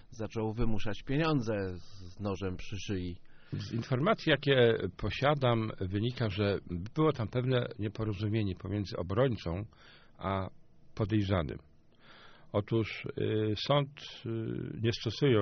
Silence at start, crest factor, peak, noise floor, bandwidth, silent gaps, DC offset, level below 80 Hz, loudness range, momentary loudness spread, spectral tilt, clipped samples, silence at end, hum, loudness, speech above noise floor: 0.05 s; 20 dB; -12 dBFS; -57 dBFS; 6.6 kHz; none; under 0.1%; -50 dBFS; 5 LU; 12 LU; -5.5 dB/octave; under 0.1%; 0 s; none; -33 LUFS; 26 dB